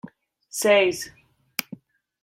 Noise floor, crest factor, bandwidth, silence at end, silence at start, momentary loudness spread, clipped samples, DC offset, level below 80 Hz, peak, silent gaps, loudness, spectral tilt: -46 dBFS; 22 dB; 16.5 kHz; 0.6 s; 0.05 s; 18 LU; under 0.1%; under 0.1%; -68 dBFS; -4 dBFS; none; -23 LUFS; -2.5 dB/octave